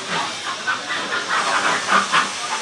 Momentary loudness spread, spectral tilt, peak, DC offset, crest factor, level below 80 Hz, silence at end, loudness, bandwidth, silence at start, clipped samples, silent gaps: 7 LU; -1 dB/octave; -4 dBFS; under 0.1%; 18 dB; -70 dBFS; 0 s; -20 LUFS; 12 kHz; 0 s; under 0.1%; none